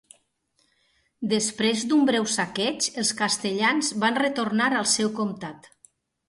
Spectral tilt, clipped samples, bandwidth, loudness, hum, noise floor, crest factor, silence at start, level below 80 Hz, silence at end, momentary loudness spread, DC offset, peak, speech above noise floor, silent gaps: -2.5 dB/octave; under 0.1%; 11.5 kHz; -23 LUFS; none; -70 dBFS; 18 dB; 1.2 s; -68 dBFS; 0.7 s; 7 LU; under 0.1%; -8 dBFS; 45 dB; none